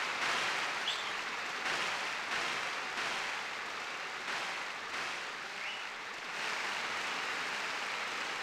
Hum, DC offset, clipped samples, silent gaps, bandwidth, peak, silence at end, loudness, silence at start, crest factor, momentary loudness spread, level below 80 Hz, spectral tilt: none; under 0.1%; under 0.1%; none; 17.5 kHz; -22 dBFS; 0 s; -36 LUFS; 0 s; 16 dB; 6 LU; -76 dBFS; -0.5 dB/octave